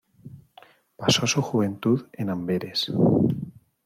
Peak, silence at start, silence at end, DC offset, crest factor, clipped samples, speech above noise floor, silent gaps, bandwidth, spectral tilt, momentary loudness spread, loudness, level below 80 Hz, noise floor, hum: -6 dBFS; 0.25 s; 0.35 s; under 0.1%; 20 dB; under 0.1%; 31 dB; none; 16.5 kHz; -5 dB/octave; 9 LU; -24 LUFS; -60 dBFS; -54 dBFS; none